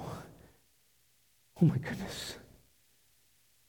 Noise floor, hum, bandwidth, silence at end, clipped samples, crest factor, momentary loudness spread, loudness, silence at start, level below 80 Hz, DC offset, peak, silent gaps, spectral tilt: -70 dBFS; none; 19.5 kHz; 1.25 s; under 0.1%; 22 dB; 20 LU; -34 LUFS; 0 s; -62 dBFS; under 0.1%; -14 dBFS; none; -6.5 dB/octave